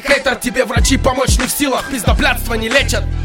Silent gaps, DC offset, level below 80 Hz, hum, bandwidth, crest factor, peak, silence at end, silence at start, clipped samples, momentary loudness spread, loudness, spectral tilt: none; under 0.1%; -20 dBFS; none; 17.5 kHz; 14 dB; 0 dBFS; 0 s; 0 s; under 0.1%; 3 LU; -15 LUFS; -4 dB/octave